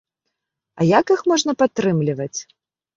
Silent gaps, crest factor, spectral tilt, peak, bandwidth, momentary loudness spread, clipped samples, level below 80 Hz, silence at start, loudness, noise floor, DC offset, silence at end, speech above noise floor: none; 18 dB; -5 dB/octave; -2 dBFS; 7.6 kHz; 11 LU; under 0.1%; -60 dBFS; 0.75 s; -19 LUFS; -79 dBFS; under 0.1%; 0.55 s; 61 dB